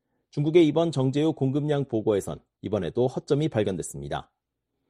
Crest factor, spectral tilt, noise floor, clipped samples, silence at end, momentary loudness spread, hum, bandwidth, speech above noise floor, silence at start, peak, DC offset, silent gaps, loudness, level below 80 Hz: 18 dB; -7 dB/octave; -81 dBFS; under 0.1%; 0.7 s; 14 LU; none; 11.5 kHz; 56 dB; 0.35 s; -6 dBFS; under 0.1%; none; -25 LUFS; -56 dBFS